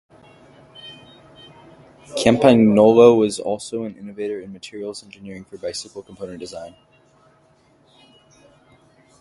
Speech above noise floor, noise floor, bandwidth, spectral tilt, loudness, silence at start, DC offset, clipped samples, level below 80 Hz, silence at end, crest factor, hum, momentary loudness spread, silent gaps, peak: 38 dB; -56 dBFS; 11.5 kHz; -6 dB/octave; -17 LUFS; 0.85 s; under 0.1%; under 0.1%; -56 dBFS; 2.5 s; 22 dB; none; 25 LU; none; 0 dBFS